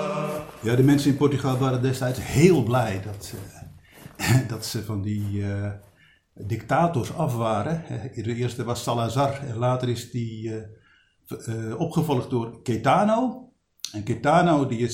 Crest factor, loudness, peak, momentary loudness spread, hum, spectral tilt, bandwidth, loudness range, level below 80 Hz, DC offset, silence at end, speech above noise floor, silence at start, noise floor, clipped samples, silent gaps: 22 dB; -24 LUFS; -2 dBFS; 15 LU; none; -6.5 dB/octave; 17 kHz; 6 LU; -52 dBFS; under 0.1%; 0 s; 34 dB; 0 s; -58 dBFS; under 0.1%; none